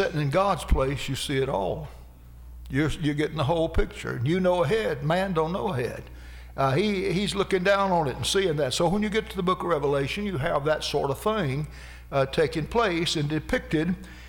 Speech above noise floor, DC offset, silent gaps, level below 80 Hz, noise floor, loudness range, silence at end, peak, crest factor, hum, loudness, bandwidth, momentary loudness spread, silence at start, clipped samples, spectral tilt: 20 dB; under 0.1%; none; -38 dBFS; -45 dBFS; 3 LU; 0 s; -12 dBFS; 14 dB; none; -26 LUFS; 18.5 kHz; 8 LU; 0 s; under 0.1%; -5.5 dB/octave